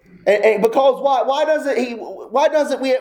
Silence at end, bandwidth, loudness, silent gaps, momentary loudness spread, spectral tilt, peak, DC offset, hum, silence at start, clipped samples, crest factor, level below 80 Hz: 0 s; 19 kHz; -17 LUFS; none; 7 LU; -4.5 dB/octave; -2 dBFS; under 0.1%; none; 0.25 s; under 0.1%; 14 dB; -64 dBFS